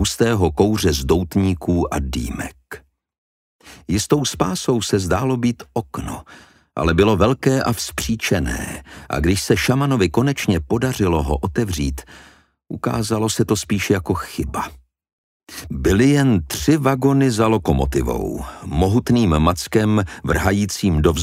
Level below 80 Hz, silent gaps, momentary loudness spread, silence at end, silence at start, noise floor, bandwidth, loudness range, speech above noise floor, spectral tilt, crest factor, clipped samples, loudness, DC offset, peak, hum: -32 dBFS; 3.18-3.59 s, 15.13-15.40 s; 13 LU; 0 s; 0 s; -40 dBFS; 16 kHz; 5 LU; 22 dB; -5.5 dB/octave; 18 dB; under 0.1%; -19 LUFS; under 0.1%; 0 dBFS; none